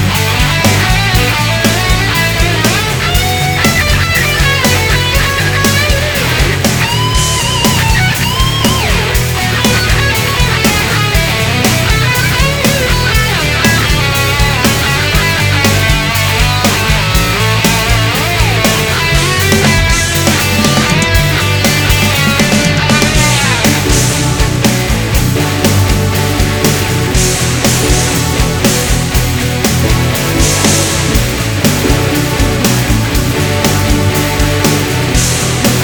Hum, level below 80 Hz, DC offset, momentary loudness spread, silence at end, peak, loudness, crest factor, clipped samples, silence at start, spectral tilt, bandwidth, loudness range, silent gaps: none; -20 dBFS; 0.1%; 3 LU; 0 s; 0 dBFS; -10 LUFS; 10 dB; 0.3%; 0 s; -3.5 dB/octave; over 20 kHz; 2 LU; none